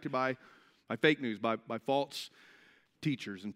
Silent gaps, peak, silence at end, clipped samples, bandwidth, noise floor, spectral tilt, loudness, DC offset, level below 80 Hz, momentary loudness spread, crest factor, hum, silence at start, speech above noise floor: none; -12 dBFS; 0.05 s; under 0.1%; 16 kHz; -64 dBFS; -5.5 dB/octave; -34 LUFS; under 0.1%; -84 dBFS; 14 LU; 24 dB; none; 0 s; 30 dB